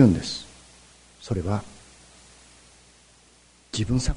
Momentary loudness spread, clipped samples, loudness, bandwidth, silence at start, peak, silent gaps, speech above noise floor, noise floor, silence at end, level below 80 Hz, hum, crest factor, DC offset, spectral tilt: 25 LU; under 0.1%; -27 LUFS; 11 kHz; 0 s; -4 dBFS; none; 34 dB; -56 dBFS; 0 s; -40 dBFS; 60 Hz at -55 dBFS; 22 dB; under 0.1%; -6 dB/octave